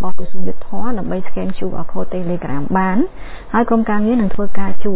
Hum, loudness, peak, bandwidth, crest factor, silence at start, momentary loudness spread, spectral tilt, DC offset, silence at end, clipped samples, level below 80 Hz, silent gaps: none; -20 LUFS; 0 dBFS; 4 kHz; 10 dB; 0 s; 11 LU; -11 dB/octave; under 0.1%; 0 s; under 0.1%; -36 dBFS; none